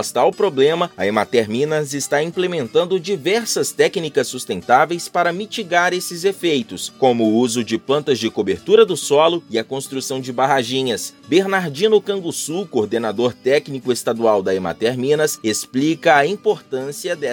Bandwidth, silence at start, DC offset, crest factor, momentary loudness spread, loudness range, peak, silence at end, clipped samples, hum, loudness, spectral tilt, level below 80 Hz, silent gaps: 17.5 kHz; 0 s; under 0.1%; 18 dB; 8 LU; 2 LU; 0 dBFS; 0 s; under 0.1%; none; -18 LUFS; -4 dB/octave; -64 dBFS; none